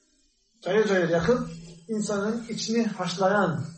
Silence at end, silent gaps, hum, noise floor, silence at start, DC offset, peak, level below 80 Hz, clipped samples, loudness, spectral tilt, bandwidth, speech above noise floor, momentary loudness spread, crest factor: 0 s; none; none; -67 dBFS; 0.65 s; under 0.1%; -8 dBFS; -56 dBFS; under 0.1%; -26 LUFS; -5 dB/octave; 8.8 kHz; 42 dB; 11 LU; 18 dB